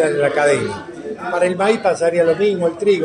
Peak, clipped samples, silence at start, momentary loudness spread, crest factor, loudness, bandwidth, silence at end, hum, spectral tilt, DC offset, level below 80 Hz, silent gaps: -2 dBFS; under 0.1%; 0 s; 11 LU; 14 dB; -17 LUFS; 10.5 kHz; 0 s; none; -5 dB/octave; under 0.1%; -60 dBFS; none